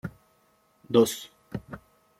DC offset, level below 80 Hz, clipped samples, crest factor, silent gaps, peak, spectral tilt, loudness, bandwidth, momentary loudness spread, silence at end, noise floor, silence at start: under 0.1%; -60 dBFS; under 0.1%; 24 dB; none; -6 dBFS; -5 dB/octave; -25 LUFS; 16 kHz; 22 LU; 0.4 s; -66 dBFS; 0.05 s